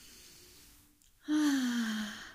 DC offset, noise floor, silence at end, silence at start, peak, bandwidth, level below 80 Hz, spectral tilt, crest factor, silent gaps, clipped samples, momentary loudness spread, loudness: under 0.1%; -64 dBFS; 0 s; 0 s; -22 dBFS; 16 kHz; -68 dBFS; -3 dB/octave; 14 dB; none; under 0.1%; 23 LU; -33 LUFS